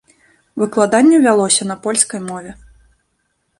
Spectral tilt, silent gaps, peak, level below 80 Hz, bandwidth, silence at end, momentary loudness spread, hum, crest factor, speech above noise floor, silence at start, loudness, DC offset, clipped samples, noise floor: -3.5 dB/octave; none; 0 dBFS; -54 dBFS; 11.5 kHz; 1.05 s; 17 LU; none; 16 dB; 53 dB; 0.55 s; -14 LUFS; under 0.1%; under 0.1%; -67 dBFS